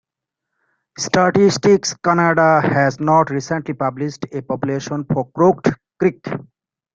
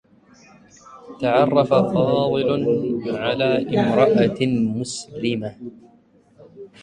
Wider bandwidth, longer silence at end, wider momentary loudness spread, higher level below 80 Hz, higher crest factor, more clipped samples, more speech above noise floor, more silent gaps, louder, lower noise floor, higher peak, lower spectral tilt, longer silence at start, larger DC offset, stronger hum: second, 9 kHz vs 10.5 kHz; first, 0.55 s vs 0.15 s; about the same, 12 LU vs 11 LU; about the same, -54 dBFS vs -56 dBFS; about the same, 16 dB vs 20 dB; neither; first, 66 dB vs 35 dB; neither; first, -17 LUFS vs -20 LUFS; first, -82 dBFS vs -54 dBFS; about the same, -2 dBFS vs -2 dBFS; about the same, -5.5 dB/octave vs -6.5 dB/octave; about the same, 1 s vs 0.9 s; neither; neither